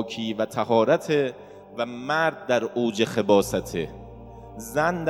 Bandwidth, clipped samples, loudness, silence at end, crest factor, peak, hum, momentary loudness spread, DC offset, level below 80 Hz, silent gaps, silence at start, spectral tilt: 16.5 kHz; under 0.1%; -24 LUFS; 0 s; 20 dB; -4 dBFS; none; 20 LU; under 0.1%; -52 dBFS; none; 0 s; -5 dB/octave